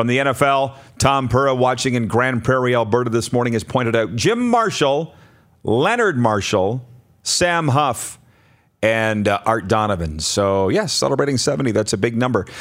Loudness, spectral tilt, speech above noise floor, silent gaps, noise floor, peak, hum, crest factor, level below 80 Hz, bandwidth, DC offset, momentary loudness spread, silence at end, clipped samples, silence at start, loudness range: -18 LUFS; -4.5 dB/octave; 38 dB; none; -55 dBFS; 0 dBFS; none; 18 dB; -46 dBFS; 16 kHz; under 0.1%; 5 LU; 0 s; under 0.1%; 0 s; 2 LU